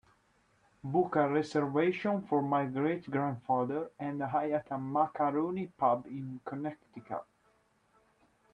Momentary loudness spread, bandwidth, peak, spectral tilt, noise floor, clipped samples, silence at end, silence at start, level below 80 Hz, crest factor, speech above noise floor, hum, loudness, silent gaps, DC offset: 12 LU; 9.6 kHz; -14 dBFS; -8 dB/octave; -71 dBFS; under 0.1%; 1.3 s; 0.85 s; -74 dBFS; 18 dB; 38 dB; none; -33 LUFS; none; under 0.1%